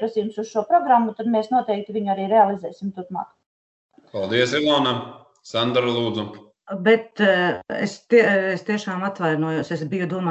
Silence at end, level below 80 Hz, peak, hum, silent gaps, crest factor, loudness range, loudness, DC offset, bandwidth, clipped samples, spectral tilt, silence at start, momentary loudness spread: 0 s; -66 dBFS; -4 dBFS; none; 3.46-3.89 s; 18 dB; 3 LU; -21 LUFS; under 0.1%; 8.4 kHz; under 0.1%; -5.5 dB/octave; 0 s; 13 LU